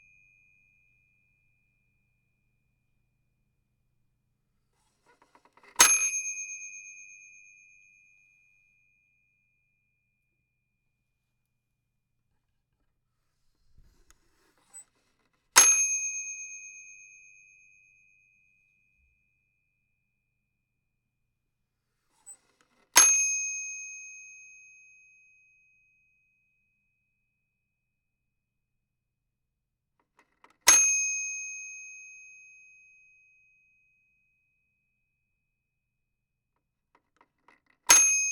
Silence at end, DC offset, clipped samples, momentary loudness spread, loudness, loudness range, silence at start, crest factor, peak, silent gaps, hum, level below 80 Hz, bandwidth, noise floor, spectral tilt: 0 s; under 0.1%; under 0.1%; 27 LU; -22 LUFS; 16 LU; 5.8 s; 34 dB; 0 dBFS; none; none; -72 dBFS; 16.5 kHz; -83 dBFS; 3 dB/octave